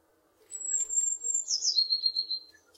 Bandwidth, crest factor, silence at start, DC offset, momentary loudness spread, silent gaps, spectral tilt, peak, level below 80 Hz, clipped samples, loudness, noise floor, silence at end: 16 kHz; 18 dB; 0.5 s; under 0.1%; 11 LU; none; 5 dB/octave; -14 dBFS; -78 dBFS; under 0.1%; -27 LUFS; -66 dBFS; 0.3 s